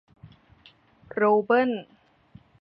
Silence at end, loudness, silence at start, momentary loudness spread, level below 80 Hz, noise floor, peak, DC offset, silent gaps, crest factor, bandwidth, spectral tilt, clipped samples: 0.8 s; -24 LUFS; 1.15 s; 15 LU; -68 dBFS; -57 dBFS; -10 dBFS; under 0.1%; none; 18 dB; 5.4 kHz; -9 dB/octave; under 0.1%